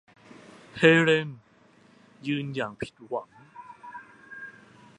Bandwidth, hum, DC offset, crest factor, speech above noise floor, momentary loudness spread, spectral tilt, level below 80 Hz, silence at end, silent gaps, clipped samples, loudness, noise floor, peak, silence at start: 10 kHz; none; under 0.1%; 26 dB; 34 dB; 26 LU; -6 dB/octave; -68 dBFS; 0.5 s; none; under 0.1%; -25 LUFS; -58 dBFS; -4 dBFS; 0.75 s